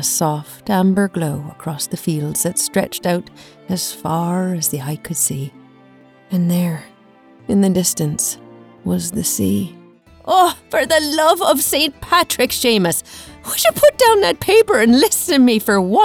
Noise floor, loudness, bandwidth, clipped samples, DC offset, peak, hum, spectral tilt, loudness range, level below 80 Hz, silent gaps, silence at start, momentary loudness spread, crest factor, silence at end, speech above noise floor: -47 dBFS; -16 LUFS; 20 kHz; under 0.1%; under 0.1%; 0 dBFS; none; -4 dB/octave; 7 LU; -50 dBFS; none; 0 s; 12 LU; 16 dB; 0 s; 31 dB